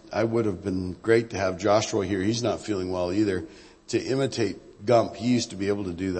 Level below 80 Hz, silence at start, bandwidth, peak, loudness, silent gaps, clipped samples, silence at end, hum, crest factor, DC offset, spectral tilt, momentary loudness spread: -56 dBFS; 0.05 s; 8.8 kHz; -6 dBFS; -26 LUFS; none; under 0.1%; 0 s; none; 20 dB; under 0.1%; -5.5 dB/octave; 7 LU